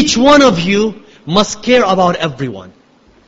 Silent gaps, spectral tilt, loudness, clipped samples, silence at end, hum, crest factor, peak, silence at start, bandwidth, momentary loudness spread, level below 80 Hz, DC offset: none; -4.5 dB/octave; -11 LUFS; under 0.1%; 0.6 s; none; 12 dB; 0 dBFS; 0 s; 8.2 kHz; 16 LU; -42 dBFS; under 0.1%